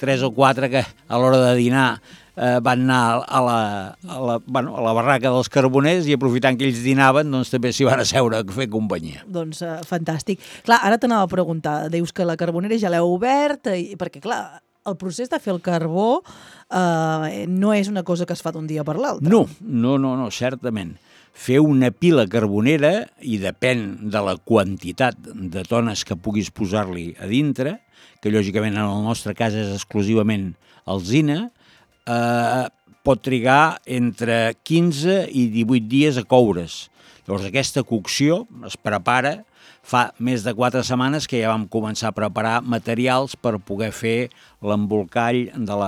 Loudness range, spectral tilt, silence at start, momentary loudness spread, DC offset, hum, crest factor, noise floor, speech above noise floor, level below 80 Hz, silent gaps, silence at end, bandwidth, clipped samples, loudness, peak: 5 LU; -5.5 dB/octave; 0 s; 11 LU; under 0.1%; none; 20 dB; -55 dBFS; 35 dB; -56 dBFS; none; 0 s; 15 kHz; under 0.1%; -20 LUFS; 0 dBFS